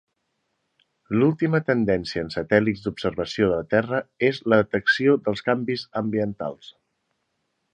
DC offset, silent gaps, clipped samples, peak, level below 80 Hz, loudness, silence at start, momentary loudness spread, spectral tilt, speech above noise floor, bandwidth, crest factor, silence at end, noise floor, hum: under 0.1%; none; under 0.1%; -2 dBFS; -54 dBFS; -23 LUFS; 1.1 s; 9 LU; -7 dB/octave; 53 dB; 9.4 kHz; 20 dB; 1.05 s; -75 dBFS; none